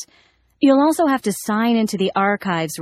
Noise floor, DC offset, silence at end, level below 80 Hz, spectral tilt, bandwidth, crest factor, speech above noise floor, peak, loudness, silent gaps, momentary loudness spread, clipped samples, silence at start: -57 dBFS; under 0.1%; 0 s; -62 dBFS; -5 dB/octave; 15.5 kHz; 16 dB; 39 dB; -4 dBFS; -18 LUFS; none; 7 LU; under 0.1%; 0 s